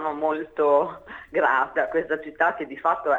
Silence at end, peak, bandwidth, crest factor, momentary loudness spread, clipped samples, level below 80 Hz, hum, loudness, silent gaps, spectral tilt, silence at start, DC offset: 0 s; -8 dBFS; 7.4 kHz; 16 dB; 8 LU; under 0.1%; -60 dBFS; none; -24 LUFS; none; -6.5 dB/octave; 0 s; under 0.1%